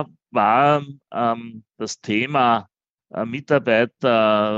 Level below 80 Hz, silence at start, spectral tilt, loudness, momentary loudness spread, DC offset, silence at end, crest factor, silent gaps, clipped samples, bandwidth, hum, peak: -68 dBFS; 0 s; -5.5 dB/octave; -20 LUFS; 14 LU; under 0.1%; 0 s; 18 dB; 2.89-2.98 s; under 0.1%; 8 kHz; none; -2 dBFS